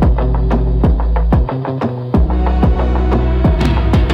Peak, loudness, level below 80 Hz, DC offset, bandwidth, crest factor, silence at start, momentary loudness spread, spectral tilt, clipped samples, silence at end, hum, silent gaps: -2 dBFS; -15 LUFS; -14 dBFS; under 0.1%; 5.4 kHz; 10 dB; 0 s; 4 LU; -9 dB/octave; under 0.1%; 0 s; none; none